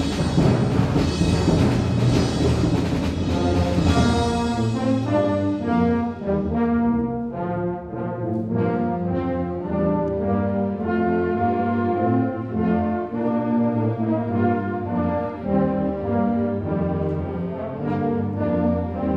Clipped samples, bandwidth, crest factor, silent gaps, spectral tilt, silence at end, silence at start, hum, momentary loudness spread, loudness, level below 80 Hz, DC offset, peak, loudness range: under 0.1%; 11 kHz; 16 dB; none; -7.5 dB/octave; 0 s; 0 s; none; 6 LU; -22 LUFS; -36 dBFS; under 0.1%; -6 dBFS; 4 LU